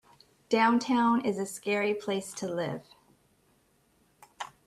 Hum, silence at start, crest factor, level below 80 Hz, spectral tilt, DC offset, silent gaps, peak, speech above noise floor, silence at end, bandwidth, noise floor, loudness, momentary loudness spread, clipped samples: none; 0.5 s; 20 dB; -72 dBFS; -4.5 dB/octave; under 0.1%; none; -12 dBFS; 40 dB; 0.2 s; 13.5 kHz; -68 dBFS; -29 LUFS; 14 LU; under 0.1%